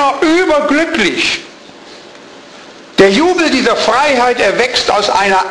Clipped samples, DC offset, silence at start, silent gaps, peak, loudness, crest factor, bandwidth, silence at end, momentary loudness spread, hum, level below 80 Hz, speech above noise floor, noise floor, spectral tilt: under 0.1%; under 0.1%; 0 s; none; 0 dBFS; -11 LUFS; 12 dB; 11 kHz; 0 s; 3 LU; none; -44 dBFS; 24 dB; -35 dBFS; -3 dB/octave